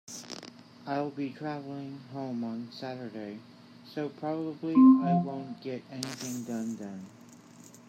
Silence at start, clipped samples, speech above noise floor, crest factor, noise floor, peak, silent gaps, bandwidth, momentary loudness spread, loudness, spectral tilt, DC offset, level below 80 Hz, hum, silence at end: 0.1 s; under 0.1%; 23 dB; 20 dB; -53 dBFS; -10 dBFS; none; 15 kHz; 21 LU; -30 LUFS; -6.5 dB/octave; under 0.1%; -82 dBFS; none; 0.05 s